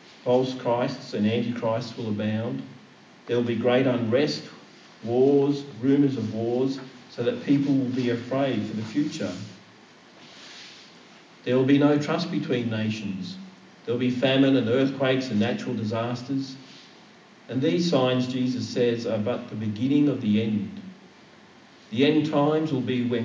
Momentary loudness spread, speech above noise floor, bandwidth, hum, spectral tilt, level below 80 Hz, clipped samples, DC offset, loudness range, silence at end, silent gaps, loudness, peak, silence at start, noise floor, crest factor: 15 LU; 27 dB; 7.6 kHz; none; -7 dB/octave; -68 dBFS; under 0.1%; under 0.1%; 3 LU; 0 s; none; -25 LUFS; -8 dBFS; 0.25 s; -51 dBFS; 18 dB